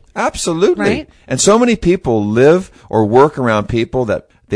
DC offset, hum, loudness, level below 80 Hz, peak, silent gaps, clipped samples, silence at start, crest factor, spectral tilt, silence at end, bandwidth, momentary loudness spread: under 0.1%; none; -14 LUFS; -38 dBFS; 0 dBFS; none; 0.1%; 0.15 s; 14 dB; -5 dB/octave; 0 s; 11 kHz; 9 LU